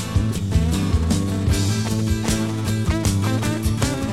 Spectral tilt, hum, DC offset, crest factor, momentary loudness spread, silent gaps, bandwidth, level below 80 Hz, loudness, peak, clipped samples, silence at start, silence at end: -5.5 dB/octave; none; 0.6%; 16 dB; 2 LU; none; 15.5 kHz; -28 dBFS; -21 LUFS; -4 dBFS; under 0.1%; 0 s; 0 s